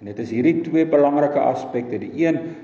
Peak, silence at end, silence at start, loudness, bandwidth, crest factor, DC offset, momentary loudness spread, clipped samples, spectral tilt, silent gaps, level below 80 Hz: -6 dBFS; 0 s; 0 s; -20 LUFS; 7.2 kHz; 14 dB; under 0.1%; 10 LU; under 0.1%; -8 dB/octave; none; -62 dBFS